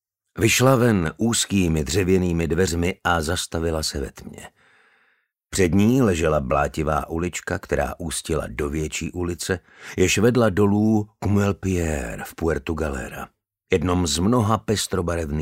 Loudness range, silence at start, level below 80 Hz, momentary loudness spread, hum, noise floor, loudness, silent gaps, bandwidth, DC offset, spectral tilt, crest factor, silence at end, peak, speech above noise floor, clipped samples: 4 LU; 0.35 s; -38 dBFS; 11 LU; none; -66 dBFS; -22 LUFS; none; 16 kHz; under 0.1%; -5 dB/octave; 18 dB; 0 s; -4 dBFS; 45 dB; under 0.1%